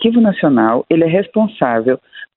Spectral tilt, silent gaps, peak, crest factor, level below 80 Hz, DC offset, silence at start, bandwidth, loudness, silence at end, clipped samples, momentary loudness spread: -11.5 dB/octave; none; 0 dBFS; 14 dB; -56 dBFS; under 0.1%; 0 s; 4.1 kHz; -14 LUFS; 0.1 s; under 0.1%; 5 LU